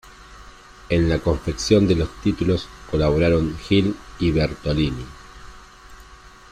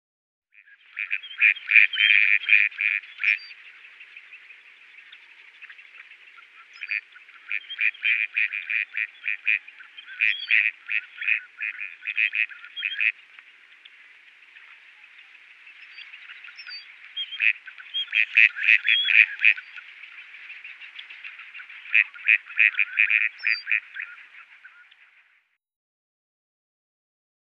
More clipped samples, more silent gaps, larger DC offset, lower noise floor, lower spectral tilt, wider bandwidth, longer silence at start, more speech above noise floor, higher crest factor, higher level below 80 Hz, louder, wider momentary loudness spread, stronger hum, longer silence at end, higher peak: neither; neither; neither; second, -45 dBFS vs -66 dBFS; first, -6.5 dB/octave vs 4 dB/octave; first, 11 kHz vs 6.8 kHz; second, 0.2 s vs 0.95 s; second, 25 dB vs 43 dB; second, 18 dB vs 26 dB; first, -36 dBFS vs under -90 dBFS; about the same, -21 LUFS vs -21 LUFS; second, 8 LU vs 24 LU; neither; second, 0.35 s vs 3.1 s; second, -4 dBFS vs 0 dBFS